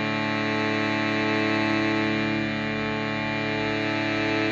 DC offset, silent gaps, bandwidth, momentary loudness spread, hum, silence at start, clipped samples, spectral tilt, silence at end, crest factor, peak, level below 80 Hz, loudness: under 0.1%; none; 8 kHz; 4 LU; none; 0 s; under 0.1%; -5.5 dB/octave; 0 s; 12 dB; -12 dBFS; -56 dBFS; -25 LUFS